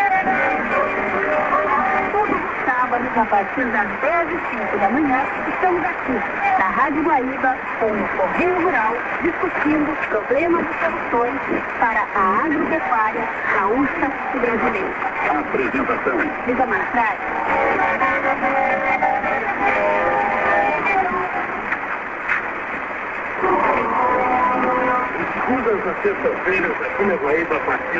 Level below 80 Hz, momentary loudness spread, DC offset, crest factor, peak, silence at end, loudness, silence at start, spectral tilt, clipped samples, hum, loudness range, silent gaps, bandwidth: -48 dBFS; 4 LU; under 0.1%; 16 dB; -4 dBFS; 0 s; -19 LUFS; 0 s; -6.5 dB/octave; under 0.1%; none; 2 LU; none; 7.8 kHz